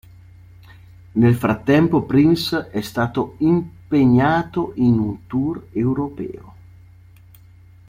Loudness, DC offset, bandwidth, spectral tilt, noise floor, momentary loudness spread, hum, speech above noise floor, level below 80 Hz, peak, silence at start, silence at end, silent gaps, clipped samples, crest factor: -19 LUFS; under 0.1%; 16 kHz; -7.5 dB/octave; -46 dBFS; 10 LU; none; 28 dB; -48 dBFS; -2 dBFS; 1.15 s; 1.4 s; none; under 0.1%; 16 dB